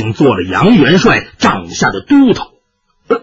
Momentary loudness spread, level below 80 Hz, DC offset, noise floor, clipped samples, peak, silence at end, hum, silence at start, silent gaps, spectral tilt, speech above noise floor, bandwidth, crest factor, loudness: 9 LU; -38 dBFS; under 0.1%; -59 dBFS; under 0.1%; 0 dBFS; 0.05 s; none; 0 s; none; -5.5 dB/octave; 49 dB; 8 kHz; 10 dB; -10 LUFS